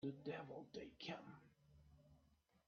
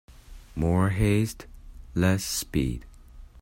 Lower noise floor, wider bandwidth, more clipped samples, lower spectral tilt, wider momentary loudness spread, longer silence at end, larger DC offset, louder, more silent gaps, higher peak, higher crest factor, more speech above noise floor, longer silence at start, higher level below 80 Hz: first, -78 dBFS vs -47 dBFS; second, 6.8 kHz vs 16.5 kHz; neither; about the same, -4.5 dB/octave vs -5.5 dB/octave; second, 11 LU vs 14 LU; about the same, 0.1 s vs 0 s; neither; second, -53 LUFS vs -26 LUFS; neither; second, -36 dBFS vs -10 dBFS; about the same, 18 dB vs 18 dB; first, 26 dB vs 22 dB; second, 0 s vs 0.3 s; second, -80 dBFS vs -40 dBFS